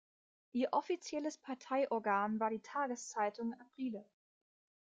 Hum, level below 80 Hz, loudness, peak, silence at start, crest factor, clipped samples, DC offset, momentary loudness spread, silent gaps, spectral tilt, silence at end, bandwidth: none; -86 dBFS; -39 LUFS; -22 dBFS; 0.55 s; 18 dB; under 0.1%; under 0.1%; 9 LU; none; -4.5 dB/octave; 0.95 s; 9.4 kHz